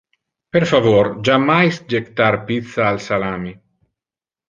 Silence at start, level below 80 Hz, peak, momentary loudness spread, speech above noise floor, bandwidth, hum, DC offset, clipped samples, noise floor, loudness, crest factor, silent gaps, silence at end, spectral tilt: 0.55 s; -50 dBFS; -2 dBFS; 9 LU; over 74 dB; 7.6 kHz; none; under 0.1%; under 0.1%; under -90 dBFS; -17 LUFS; 16 dB; none; 0.95 s; -6.5 dB/octave